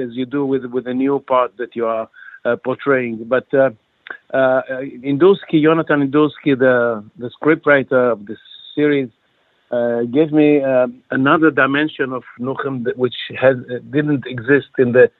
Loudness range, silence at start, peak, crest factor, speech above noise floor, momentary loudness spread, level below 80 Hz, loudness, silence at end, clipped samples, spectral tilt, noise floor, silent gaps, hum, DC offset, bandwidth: 3 LU; 0 s; 0 dBFS; 16 dB; 45 dB; 12 LU; -64 dBFS; -17 LUFS; 0.1 s; under 0.1%; -10 dB/octave; -61 dBFS; none; none; under 0.1%; 4.2 kHz